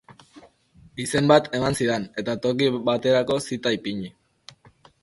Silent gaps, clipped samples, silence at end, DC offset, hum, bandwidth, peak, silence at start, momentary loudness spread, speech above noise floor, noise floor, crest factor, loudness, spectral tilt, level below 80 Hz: none; under 0.1%; 0.95 s; under 0.1%; none; 12 kHz; -2 dBFS; 0.1 s; 14 LU; 32 dB; -55 dBFS; 22 dB; -23 LUFS; -5 dB/octave; -56 dBFS